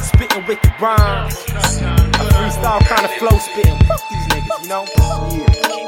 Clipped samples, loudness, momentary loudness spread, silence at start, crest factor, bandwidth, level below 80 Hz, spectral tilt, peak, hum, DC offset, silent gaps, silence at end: under 0.1%; -15 LUFS; 6 LU; 0 s; 14 dB; 17 kHz; -18 dBFS; -5 dB/octave; 0 dBFS; none; under 0.1%; none; 0 s